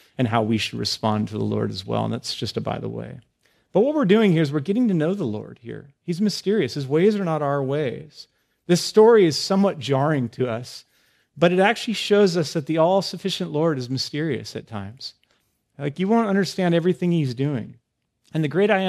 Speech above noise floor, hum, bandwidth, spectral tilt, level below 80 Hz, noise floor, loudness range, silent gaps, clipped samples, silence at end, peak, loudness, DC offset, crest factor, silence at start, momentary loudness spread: 46 dB; none; 14 kHz; -6 dB/octave; -64 dBFS; -68 dBFS; 5 LU; none; under 0.1%; 0 s; -4 dBFS; -22 LUFS; under 0.1%; 18 dB; 0.2 s; 15 LU